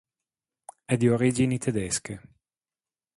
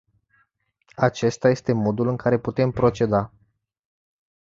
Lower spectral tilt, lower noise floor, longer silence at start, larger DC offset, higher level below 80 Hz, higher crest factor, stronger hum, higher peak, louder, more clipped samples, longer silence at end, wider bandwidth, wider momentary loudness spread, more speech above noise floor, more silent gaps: second, -5.5 dB/octave vs -7 dB/octave; first, under -90 dBFS vs -68 dBFS; about the same, 0.9 s vs 1 s; neither; about the same, -56 dBFS vs -52 dBFS; about the same, 20 dB vs 20 dB; neither; second, -10 dBFS vs -4 dBFS; second, -25 LUFS vs -22 LUFS; neither; second, 0.95 s vs 1.15 s; first, 11.5 kHz vs 7.8 kHz; first, 19 LU vs 3 LU; first, over 65 dB vs 47 dB; neither